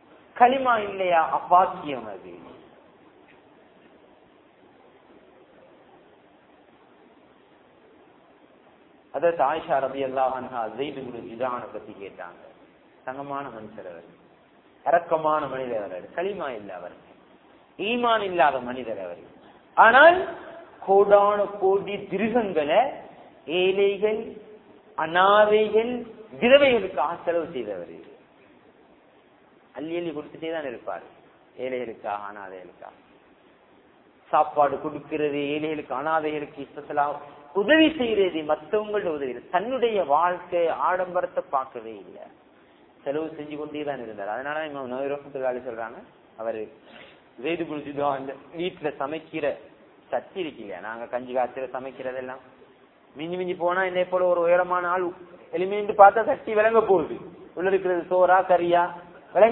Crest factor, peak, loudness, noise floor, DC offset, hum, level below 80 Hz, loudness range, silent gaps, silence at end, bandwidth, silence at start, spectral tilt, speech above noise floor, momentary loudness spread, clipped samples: 24 dB; 0 dBFS; -24 LUFS; -56 dBFS; under 0.1%; none; -66 dBFS; 13 LU; none; 0 s; 4.1 kHz; 0.35 s; -8.5 dB/octave; 32 dB; 20 LU; under 0.1%